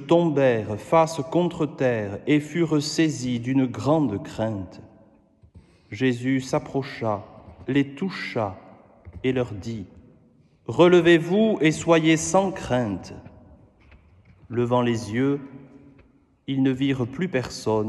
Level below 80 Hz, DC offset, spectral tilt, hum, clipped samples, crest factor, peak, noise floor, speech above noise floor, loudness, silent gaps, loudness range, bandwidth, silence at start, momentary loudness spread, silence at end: -56 dBFS; under 0.1%; -6 dB/octave; none; under 0.1%; 20 dB; -4 dBFS; -57 dBFS; 35 dB; -23 LUFS; none; 8 LU; 12 kHz; 0 s; 13 LU; 0 s